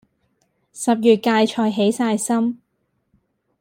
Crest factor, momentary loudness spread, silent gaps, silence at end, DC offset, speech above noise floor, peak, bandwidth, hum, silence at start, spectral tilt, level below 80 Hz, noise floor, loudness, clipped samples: 18 dB; 9 LU; none; 1.05 s; under 0.1%; 53 dB; -2 dBFS; 16 kHz; none; 0.75 s; -4.5 dB/octave; -68 dBFS; -70 dBFS; -19 LUFS; under 0.1%